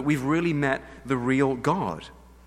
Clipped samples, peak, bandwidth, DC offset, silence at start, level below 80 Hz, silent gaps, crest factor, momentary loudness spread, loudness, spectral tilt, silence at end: under 0.1%; -8 dBFS; 14.5 kHz; under 0.1%; 0 s; -52 dBFS; none; 18 dB; 9 LU; -25 LUFS; -7 dB/octave; 0.35 s